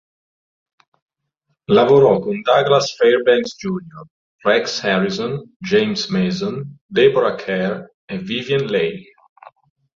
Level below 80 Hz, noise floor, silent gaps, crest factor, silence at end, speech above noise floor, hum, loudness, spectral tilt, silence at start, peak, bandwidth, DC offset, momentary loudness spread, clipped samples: -58 dBFS; -71 dBFS; 4.10-4.39 s, 5.56-5.60 s, 6.81-6.89 s, 7.94-8.08 s; 18 dB; 1 s; 55 dB; none; -17 LUFS; -5.5 dB/octave; 1.7 s; -2 dBFS; 7.4 kHz; under 0.1%; 14 LU; under 0.1%